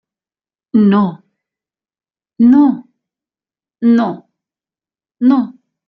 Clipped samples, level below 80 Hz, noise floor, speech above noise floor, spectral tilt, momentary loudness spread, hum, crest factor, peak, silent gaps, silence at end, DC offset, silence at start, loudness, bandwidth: under 0.1%; -60 dBFS; under -90 dBFS; over 80 dB; -9.5 dB/octave; 13 LU; none; 14 dB; -2 dBFS; none; 0.35 s; under 0.1%; 0.75 s; -13 LUFS; 5 kHz